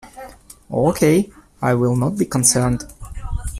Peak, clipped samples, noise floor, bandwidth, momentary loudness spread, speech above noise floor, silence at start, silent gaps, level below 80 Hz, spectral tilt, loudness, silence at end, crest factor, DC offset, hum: 0 dBFS; under 0.1%; -40 dBFS; 15.5 kHz; 20 LU; 23 dB; 0.05 s; none; -34 dBFS; -5 dB/octave; -18 LUFS; 0 s; 20 dB; under 0.1%; none